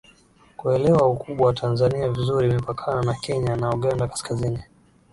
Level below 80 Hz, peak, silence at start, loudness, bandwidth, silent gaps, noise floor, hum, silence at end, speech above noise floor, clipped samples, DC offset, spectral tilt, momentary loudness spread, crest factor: -46 dBFS; -6 dBFS; 0.6 s; -22 LUFS; 11.5 kHz; none; -55 dBFS; none; 0.5 s; 33 dB; under 0.1%; under 0.1%; -7 dB/octave; 8 LU; 16 dB